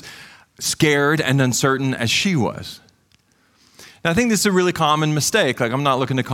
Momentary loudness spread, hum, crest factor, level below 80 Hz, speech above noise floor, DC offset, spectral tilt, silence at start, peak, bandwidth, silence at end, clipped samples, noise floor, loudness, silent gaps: 9 LU; none; 16 dB; -52 dBFS; 41 dB; under 0.1%; -4 dB/octave; 0.05 s; -4 dBFS; 17 kHz; 0 s; under 0.1%; -59 dBFS; -18 LUFS; none